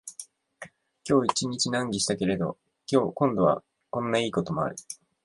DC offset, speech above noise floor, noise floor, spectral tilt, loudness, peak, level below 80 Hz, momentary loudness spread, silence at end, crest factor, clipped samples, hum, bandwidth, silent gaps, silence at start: under 0.1%; 23 dB; -49 dBFS; -4.5 dB/octave; -27 LUFS; -8 dBFS; -60 dBFS; 19 LU; 0.3 s; 20 dB; under 0.1%; none; 11.5 kHz; none; 0.05 s